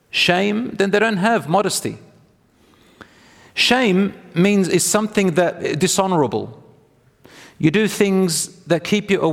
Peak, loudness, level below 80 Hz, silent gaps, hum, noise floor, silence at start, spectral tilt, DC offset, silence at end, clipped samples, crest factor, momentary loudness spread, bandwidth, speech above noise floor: 0 dBFS; -18 LUFS; -56 dBFS; none; none; -55 dBFS; 0.15 s; -4 dB/octave; under 0.1%; 0 s; under 0.1%; 18 dB; 7 LU; 16.5 kHz; 37 dB